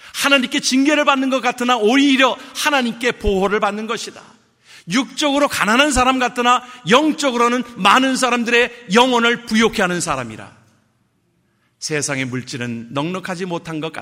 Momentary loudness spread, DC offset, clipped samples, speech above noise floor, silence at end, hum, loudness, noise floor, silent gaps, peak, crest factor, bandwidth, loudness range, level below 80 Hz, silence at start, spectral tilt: 11 LU; under 0.1%; under 0.1%; 46 dB; 0 s; none; -16 LUFS; -63 dBFS; none; 0 dBFS; 18 dB; 16 kHz; 10 LU; -42 dBFS; 0.05 s; -3.5 dB/octave